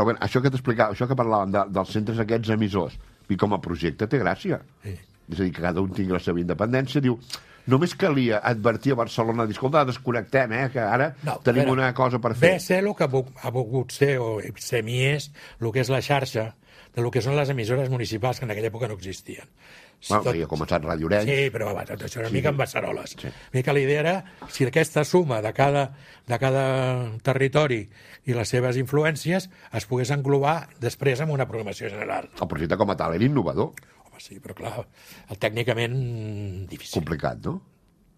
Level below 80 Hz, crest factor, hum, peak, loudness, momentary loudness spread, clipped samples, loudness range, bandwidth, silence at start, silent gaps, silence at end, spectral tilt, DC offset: -52 dBFS; 22 dB; none; -2 dBFS; -24 LUFS; 12 LU; under 0.1%; 5 LU; 14.5 kHz; 0 s; none; 0.6 s; -6 dB/octave; under 0.1%